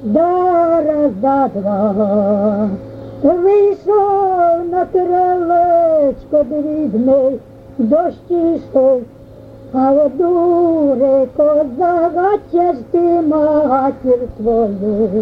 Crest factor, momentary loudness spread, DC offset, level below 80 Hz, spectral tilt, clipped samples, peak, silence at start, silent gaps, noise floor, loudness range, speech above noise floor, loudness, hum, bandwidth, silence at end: 12 dB; 5 LU; under 0.1%; -44 dBFS; -10 dB/octave; under 0.1%; -2 dBFS; 0 s; none; -36 dBFS; 2 LU; 23 dB; -14 LUFS; none; 5.2 kHz; 0 s